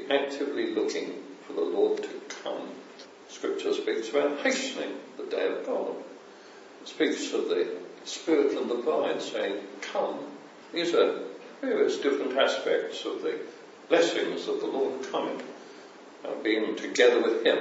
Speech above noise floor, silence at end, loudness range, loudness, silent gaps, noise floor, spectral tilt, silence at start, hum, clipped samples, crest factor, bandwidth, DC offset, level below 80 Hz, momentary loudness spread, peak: 21 dB; 0 s; 4 LU; -29 LUFS; none; -49 dBFS; -3 dB/octave; 0 s; none; under 0.1%; 22 dB; 8 kHz; under 0.1%; -90 dBFS; 19 LU; -8 dBFS